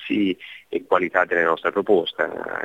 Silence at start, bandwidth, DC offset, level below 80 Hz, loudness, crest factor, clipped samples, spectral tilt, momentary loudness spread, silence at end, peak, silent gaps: 0 s; 7.8 kHz; under 0.1%; -64 dBFS; -22 LUFS; 20 dB; under 0.1%; -6.5 dB/octave; 10 LU; 0 s; -2 dBFS; none